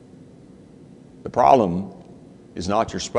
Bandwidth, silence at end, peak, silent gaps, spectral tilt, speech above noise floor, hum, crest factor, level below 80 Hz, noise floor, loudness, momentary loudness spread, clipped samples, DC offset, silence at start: 10 kHz; 0 s; 0 dBFS; none; -5.5 dB/octave; 27 dB; none; 22 dB; -52 dBFS; -46 dBFS; -20 LUFS; 22 LU; under 0.1%; under 0.1%; 1.25 s